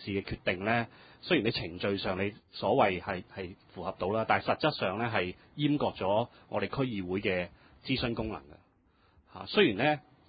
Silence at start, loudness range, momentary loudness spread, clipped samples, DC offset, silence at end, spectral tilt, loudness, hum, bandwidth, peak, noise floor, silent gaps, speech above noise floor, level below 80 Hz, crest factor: 0 s; 3 LU; 14 LU; under 0.1%; under 0.1%; 0.3 s; -3.5 dB/octave; -31 LUFS; none; 4.9 kHz; -10 dBFS; -67 dBFS; none; 35 dB; -56 dBFS; 22 dB